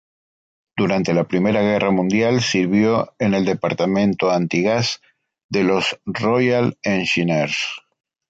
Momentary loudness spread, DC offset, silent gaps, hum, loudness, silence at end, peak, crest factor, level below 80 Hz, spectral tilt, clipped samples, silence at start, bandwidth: 6 LU; under 0.1%; 5.44-5.49 s; none; -19 LUFS; 0.5 s; -4 dBFS; 14 dB; -54 dBFS; -5.5 dB/octave; under 0.1%; 0.75 s; 8 kHz